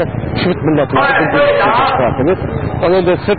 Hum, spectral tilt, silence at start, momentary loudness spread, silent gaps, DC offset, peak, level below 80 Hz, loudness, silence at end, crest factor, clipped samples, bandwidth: none; -12 dB/octave; 0 s; 6 LU; none; 1%; -2 dBFS; -32 dBFS; -13 LUFS; 0 s; 10 dB; under 0.1%; 4.8 kHz